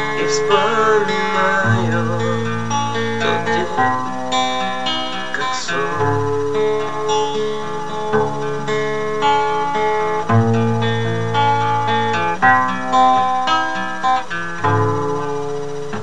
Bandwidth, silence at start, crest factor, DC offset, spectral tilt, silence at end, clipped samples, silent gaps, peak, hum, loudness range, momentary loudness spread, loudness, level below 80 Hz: 10.5 kHz; 0 s; 16 dB; 4%; -5 dB/octave; 0 s; under 0.1%; none; -2 dBFS; none; 4 LU; 7 LU; -18 LUFS; -56 dBFS